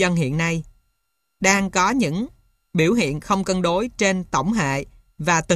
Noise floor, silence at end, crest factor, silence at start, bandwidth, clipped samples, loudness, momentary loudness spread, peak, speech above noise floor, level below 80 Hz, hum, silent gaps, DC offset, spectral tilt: -74 dBFS; 0 s; 18 dB; 0 s; 14 kHz; under 0.1%; -21 LUFS; 9 LU; -4 dBFS; 54 dB; -46 dBFS; none; none; under 0.1%; -4.5 dB/octave